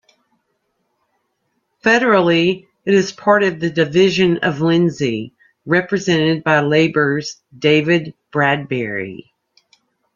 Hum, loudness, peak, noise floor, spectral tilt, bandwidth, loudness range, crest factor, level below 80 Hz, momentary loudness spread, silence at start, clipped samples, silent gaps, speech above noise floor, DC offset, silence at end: none; -16 LUFS; -2 dBFS; -69 dBFS; -5.5 dB/octave; 7.4 kHz; 3 LU; 16 dB; -56 dBFS; 11 LU; 1.85 s; under 0.1%; none; 53 dB; under 0.1%; 1 s